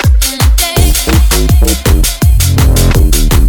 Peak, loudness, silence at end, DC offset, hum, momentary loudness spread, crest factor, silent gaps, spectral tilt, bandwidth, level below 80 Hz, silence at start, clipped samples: 0 dBFS; -9 LUFS; 0 s; under 0.1%; none; 1 LU; 6 dB; none; -4.5 dB/octave; 19 kHz; -8 dBFS; 0 s; 0.3%